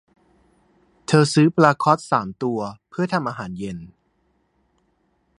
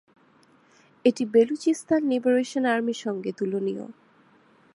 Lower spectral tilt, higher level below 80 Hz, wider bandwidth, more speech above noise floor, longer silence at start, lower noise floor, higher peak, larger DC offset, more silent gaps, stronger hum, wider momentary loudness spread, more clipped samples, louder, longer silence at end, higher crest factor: about the same, -6 dB/octave vs -5.5 dB/octave; first, -58 dBFS vs -78 dBFS; about the same, 11 kHz vs 11.5 kHz; first, 47 dB vs 35 dB; about the same, 1.1 s vs 1.05 s; first, -66 dBFS vs -59 dBFS; first, 0 dBFS vs -8 dBFS; neither; neither; neither; first, 16 LU vs 9 LU; neither; first, -20 LUFS vs -25 LUFS; first, 1.55 s vs 0.85 s; about the same, 22 dB vs 18 dB